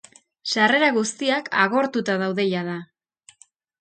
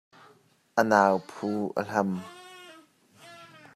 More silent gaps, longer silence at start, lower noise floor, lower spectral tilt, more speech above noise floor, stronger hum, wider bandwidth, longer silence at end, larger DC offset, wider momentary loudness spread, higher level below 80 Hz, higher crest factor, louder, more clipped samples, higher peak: neither; second, 0.45 s vs 0.75 s; second, -57 dBFS vs -61 dBFS; second, -4 dB/octave vs -6 dB/octave; about the same, 36 dB vs 35 dB; neither; second, 9.4 kHz vs 14 kHz; first, 0.95 s vs 0.3 s; neither; second, 12 LU vs 26 LU; first, -72 dBFS vs -78 dBFS; about the same, 20 dB vs 24 dB; first, -21 LUFS vs -27 LUFS; neither; about the same, -4 dBFS vs -4 dBFS